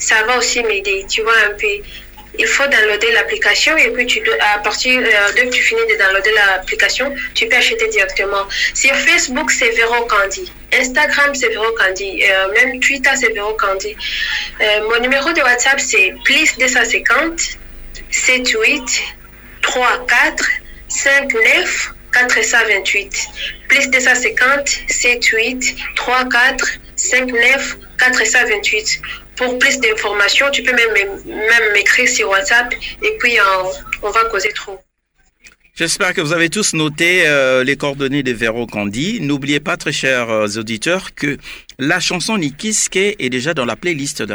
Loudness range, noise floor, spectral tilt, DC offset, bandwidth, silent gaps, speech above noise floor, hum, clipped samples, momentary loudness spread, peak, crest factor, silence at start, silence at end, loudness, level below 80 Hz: 5 LU; -59 dBFS; -1.5 dB/octave; under 0.1%; over 20 kHz; none; 44 dB; none; under 0.1%; 9 LU; -2 dBFS; 12 dB; 0 s; 0 s; -13 LUFS; -40 dBFS